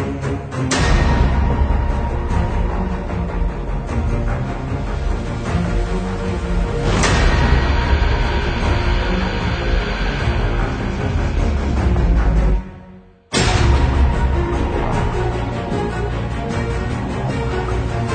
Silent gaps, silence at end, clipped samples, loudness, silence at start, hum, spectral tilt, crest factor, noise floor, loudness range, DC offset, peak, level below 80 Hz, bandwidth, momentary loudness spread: none; 0 s; under 0.1%; -19 LUFS; 0 s; none; -6 dB/octave; 16 dB; -42 dBFS; 4 LU; under 0.1%; -2 dBFS; -20 dBFS; 9.4 kHz; 7 LU